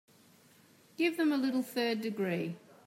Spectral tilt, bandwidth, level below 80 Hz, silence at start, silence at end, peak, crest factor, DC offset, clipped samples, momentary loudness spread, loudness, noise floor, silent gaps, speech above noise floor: -5.5 dB/octave; 16 kHz; -88 dBFS; 1 s; 0.3 s; -18 dBFS; 16 dB; under 0.1%; under 0.1%; 8 LU; -33 LUFS; -62 dBFS; none; 30 dB